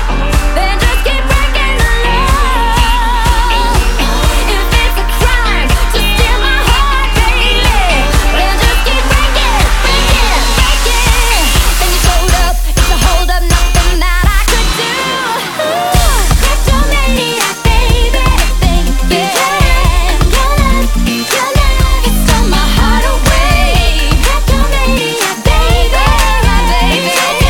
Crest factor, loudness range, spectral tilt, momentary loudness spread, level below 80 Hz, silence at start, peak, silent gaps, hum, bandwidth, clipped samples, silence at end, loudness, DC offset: 8 dB; 2 LU; -3.5 dB/octave; 3 LU; -10 dBFS; 0 s; 0 dBFS; none; none; 18 kHz; under 0.1%; 0 s; -11 LUFS; under 0.1%